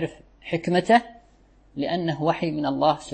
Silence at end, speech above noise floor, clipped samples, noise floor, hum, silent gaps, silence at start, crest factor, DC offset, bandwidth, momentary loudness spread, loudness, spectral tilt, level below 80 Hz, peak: 0 s; 33 dB; under 0.1%; -56 dBFS; none; none; 0 s; 20 dB; under 0.1%; 8.8 kHz; 13 LU; -24 LUFS; -6 dB/octave; -56 dBFS; -6 dBFS